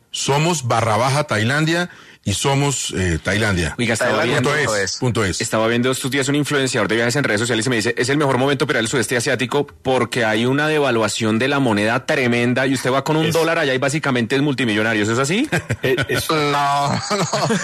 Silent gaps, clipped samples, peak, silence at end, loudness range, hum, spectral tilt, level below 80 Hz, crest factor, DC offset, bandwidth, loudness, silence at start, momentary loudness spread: none; under 0.1%; -6 dBFS; 0 s; 1 LU; none; -4.5 dB/octave; -48 dBFS; 12 dB; under 0.1%; 14 kHz; -18 LUFS; 0.15 s; 3 LU